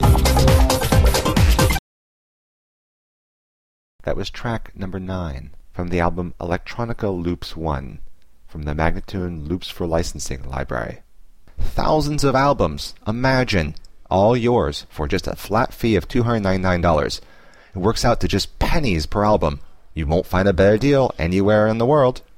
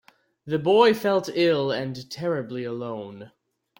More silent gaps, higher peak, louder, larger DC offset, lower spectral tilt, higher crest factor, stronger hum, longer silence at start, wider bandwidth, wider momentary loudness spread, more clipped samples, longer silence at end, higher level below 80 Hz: first, 1.79-3.99 s vs none; first, -2 dBFS vs -6 dBFS; first, -20 LUFS vs -24 LUFS; first, 0.7% vs under 0.1%; about the same, -6 dB/octave vs -6 dB/octave; about the same, 16 dB vs 20 dB; neither; second, 0 s vs 0.45 s; about the same, 16 kHz vs 17 kHz; about the same, 13 LU vs 15 LU; neither; second, 0.2 s vs 0.5 s; first, -26 dBFS vs -68 dBFS